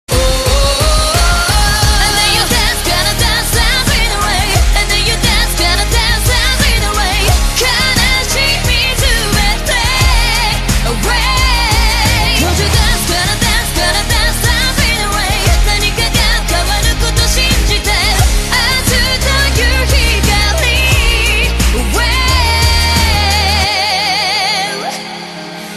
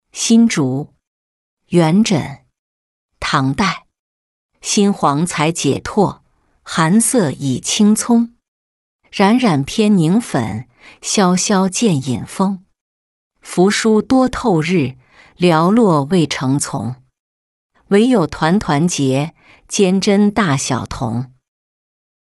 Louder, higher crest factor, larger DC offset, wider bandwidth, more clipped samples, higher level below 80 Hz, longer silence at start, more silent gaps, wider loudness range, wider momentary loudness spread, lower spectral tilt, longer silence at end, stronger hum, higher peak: first, -11 LUFS vs -15 LUFS; about the same, 12 dB vs 14 dB; first, 0.2% vs under 0.1%; first, 14 kHz vs 12 kHz; neither; first, -16 dBFS vs -46 dBFS; about the same, 0.1 s vs 0.15 s; second, none vs 1.07-1.57 s, 2.59-3.09 s, 3.99-4.49 s, 8.48-8.99 s, 12.81-13.30 s, 17.20-17.70 s; about the same, 1 LU vs 3 LU; second, 3 LU vs 12 LU; second, -3 dB/octave vs -5 dB/octave; second, 0 s vs 1.1 s; neither; about the same, 0 dBFS vs -2 dBFS